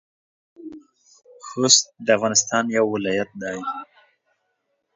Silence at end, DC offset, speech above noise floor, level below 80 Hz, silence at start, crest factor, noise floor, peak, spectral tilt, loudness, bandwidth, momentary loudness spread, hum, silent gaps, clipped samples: 1.1 s; under 0.1%; 53 dB; -66 dBFS; 0.6 s; 24 dB; -73 dBFS; 0 dBFS; -2 dB/octave; -20 LUFS; 7.8 kHz; 26 LU; none; none; under 0.1%